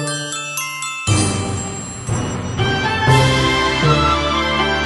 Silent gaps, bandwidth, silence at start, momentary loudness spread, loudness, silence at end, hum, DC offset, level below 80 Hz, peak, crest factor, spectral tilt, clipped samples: none; 12 kHz; 0 s; 9 LU; -17 LUFS; 0 s; none; under 0.1%; -32 dBFS; 0 dBFS; 16 dB; -4 dB/octave; under 0.1%